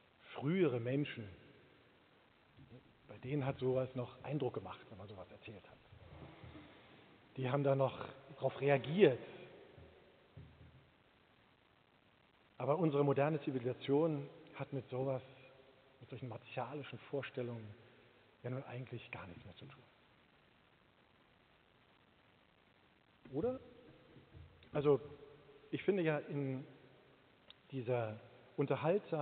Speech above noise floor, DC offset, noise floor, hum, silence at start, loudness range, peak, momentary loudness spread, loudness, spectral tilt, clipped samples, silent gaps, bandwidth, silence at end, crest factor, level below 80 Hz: 33 dB; under 0.1%; -71 dBFS; none; 0.25 s; 13 LU; -14 dBFS; 25 LU; -39 LUFS; -6.5 dB/octave; under 0.1%; none; 4.5 kHz; 0 s; 26 dB; -76 dBFS